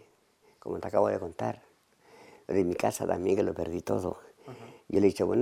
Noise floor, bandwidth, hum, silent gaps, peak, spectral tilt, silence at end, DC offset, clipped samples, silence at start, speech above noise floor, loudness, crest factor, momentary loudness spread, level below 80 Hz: -65 dBFS; 15.5 kHz; none; none; -10 dBFS; -6.5 dB/octave; 0 s; under 0.1%; under 0.1%; 0.65 s; 36 dB; -30 LUFS; 20 dB; 21 LU; -62 dBFS